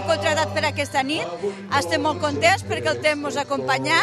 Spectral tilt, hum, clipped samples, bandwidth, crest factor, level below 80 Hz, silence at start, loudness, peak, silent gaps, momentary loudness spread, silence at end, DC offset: -3.5 dB/octave; none; under 0.1%; 14 kHz; 18 dB; -60 dBFS; 0 s; -22 LUFS; -4 dBFS; none; 6 LU; 0 s; under 0.1%